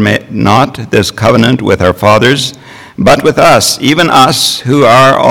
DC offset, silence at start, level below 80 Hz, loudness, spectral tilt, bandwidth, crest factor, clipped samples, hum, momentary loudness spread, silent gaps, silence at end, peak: under 0.1%; 0 s; -36 dBFS; -7 LUFS; -4.5 dB/octave; 19.5 kHz; 8 dB; 4%; none; 6 LU; none; 0 s; 0 dBFS